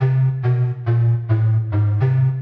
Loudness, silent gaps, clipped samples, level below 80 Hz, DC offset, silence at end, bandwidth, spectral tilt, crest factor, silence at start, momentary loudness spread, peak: -18 LUFS; none; under 0.1%; -48 dBFS; under 0.1%; 0 s; 3.6 kHz; -11 dB/octave; 10 dB; 0 s; 2 LU; -6 dBFS